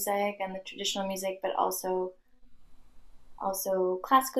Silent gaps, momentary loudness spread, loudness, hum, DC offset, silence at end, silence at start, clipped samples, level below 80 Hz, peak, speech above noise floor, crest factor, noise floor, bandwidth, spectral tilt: none; 10 LU; -31 LUFS; none; under 0.1%; 0 s; 0 s; under 0.1%; -62 dBFS; -10 dBFS; 21 dB; 20 dB; -51 dBFS; 15 kHz; -3 dB/octave